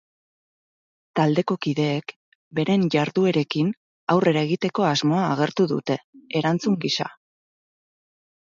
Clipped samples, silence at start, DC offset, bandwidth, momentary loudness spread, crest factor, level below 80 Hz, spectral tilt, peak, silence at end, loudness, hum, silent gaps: under 0.1%; 1.15 s; under 0.1%; 7.6 kHz; 9 LU; 18 dB; -68 dBFS; -6 dB/octave; -6 dBFS; 1.4 s; -23 LUFS; none; 2.16-2.51 s, 3.77-4.07 s, 6.04-6.13 s